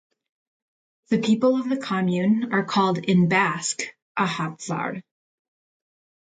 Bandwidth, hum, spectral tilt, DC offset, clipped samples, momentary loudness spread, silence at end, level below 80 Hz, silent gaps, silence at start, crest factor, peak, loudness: 9.4 kHz; none; -5.5 dB/octave; under 0.1%; under 0.1%; 9 LU; 1.2 s; -66 dBFS; 4.02-4.15 s; 1.1 s; 18 dB; -6 dBFS; -23 LUFS